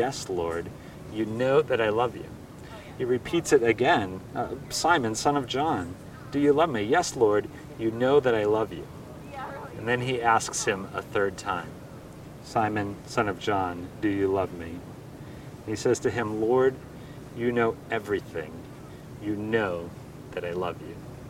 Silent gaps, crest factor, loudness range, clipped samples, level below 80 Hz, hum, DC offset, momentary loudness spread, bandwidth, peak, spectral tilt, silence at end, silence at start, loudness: none; 20 dB; 5 LU; under 0.1%; -56 dBFS; none; under 0.1%; 20 LU; 16 kHz; -6 dBFS; -5 dB/octave; 0 s; 0 s; -27 LUFS